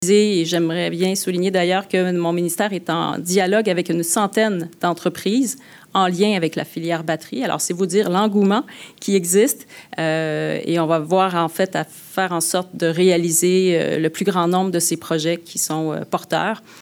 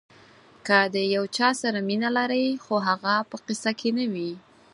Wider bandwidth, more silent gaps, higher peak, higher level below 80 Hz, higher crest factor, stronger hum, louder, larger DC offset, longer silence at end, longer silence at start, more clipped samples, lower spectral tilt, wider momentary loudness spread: first, 20 kHz vs 11.5 kHz; neither; about the same, -4 dBFS vs -4 dBFS; about the same, -72 dBFS vs -74 dBFS; second, 14 dB vs 22 dB; neither; first, -19 LUFS vs -25 LUFS; neither; second, 0 s vs 0.35 s; second, 0 s vs 0.65 s; neither; about the same, -4.5 dB/octave vs -4 dB/octave; second, 7 LU vs 11 LU